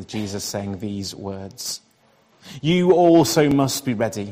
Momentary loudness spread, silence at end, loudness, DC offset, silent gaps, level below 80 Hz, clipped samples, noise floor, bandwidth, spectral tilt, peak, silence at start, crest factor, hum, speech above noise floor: 17 LU; 0 s; -20 LUFS; under 0.1%; none; -56 dBFS; under 0.1%; -58 dBFS; 16 kHz; -5 dB/octave; -2 dBFS; 0 s; 18 dB; none; 38 dB